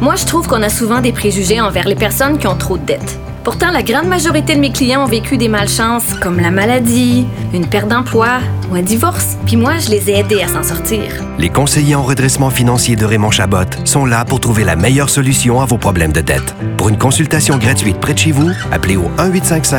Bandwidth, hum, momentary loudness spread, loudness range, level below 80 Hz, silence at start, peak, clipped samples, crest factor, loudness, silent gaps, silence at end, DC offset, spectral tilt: over 20 kHz; none; 5 LU; 2 LU; -30 dBFS; 0 s; 0 dBFS; under 0.1%; 12 dB; -12 LUFS; none; 0 s; under 0.1%; -4.5 dB/octave